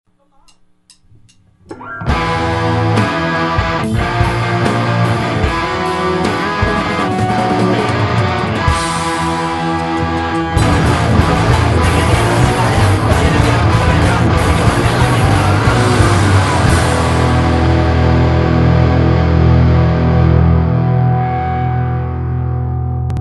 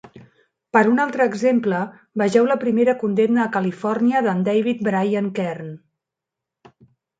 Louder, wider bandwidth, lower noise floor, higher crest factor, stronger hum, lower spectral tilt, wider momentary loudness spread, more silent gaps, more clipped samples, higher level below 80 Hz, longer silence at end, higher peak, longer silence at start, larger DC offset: first, -13 LUFS vs -20 LUFS; first, 12 kHz vs 9 kHz; second, -49 dBFS vs -85 dBFS; second, 12 dB vs 20 dB; neither; about the same, -6 dB/octave vs -7 dB/octave; second, 5 LU vs 8 LU; neither; neither; first, -22 dBFS vs -68 dBFS; second, 0 s vs 1.4 s; about the same, 0 dBFS vs -2 dBFS; first, 1.7 s vs 0.05 s; neither